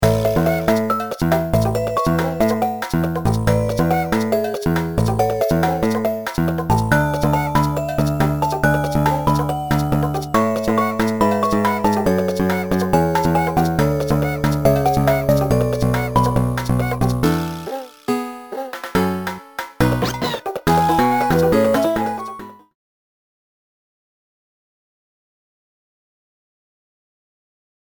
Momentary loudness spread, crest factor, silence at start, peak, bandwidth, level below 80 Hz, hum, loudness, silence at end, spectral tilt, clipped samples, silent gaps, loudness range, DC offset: 6 LU; 18 dB; 0 s; 0 dBFS; over 20 kHz; -36 dBFS; none; -18 LUFS; 5.2 s; -6.5 dB/octave; under 0.1%; none; 4 LU; 0.8%